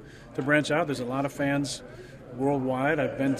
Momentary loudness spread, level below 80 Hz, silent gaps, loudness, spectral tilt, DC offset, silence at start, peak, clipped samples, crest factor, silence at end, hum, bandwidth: 14 LU; -56 dBFS; none; -27 LUFS; -5.5 dB/octave; under 0.1%; 0 s; -10 dBFS; under 0.1%; 18 dB; 0 s; none; 14.5 kHz